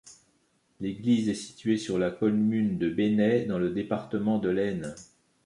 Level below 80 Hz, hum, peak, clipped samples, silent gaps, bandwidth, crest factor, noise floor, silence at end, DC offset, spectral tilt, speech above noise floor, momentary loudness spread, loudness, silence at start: -60 dBFS; none; -12 dBFS; under 0.1%; none; 11 kHz; 16 dB; -69 dBFS; 0.4 s; under 0.1%; -6.5 dB/octave; 42 dB; 10 LU; -28 LUFS; 0.05 s